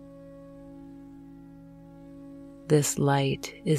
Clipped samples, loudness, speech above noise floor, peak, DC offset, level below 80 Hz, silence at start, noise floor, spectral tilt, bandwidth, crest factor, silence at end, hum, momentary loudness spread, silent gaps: under 0.1%; -26 LUFS; 23 dB; -10 dBFS; under 0.1%; -58 dBFS; 0 s; -48 dBFS; -5 dB/octave; 15.5 kHz; 20 dB; 0 s; none; 24 LU; none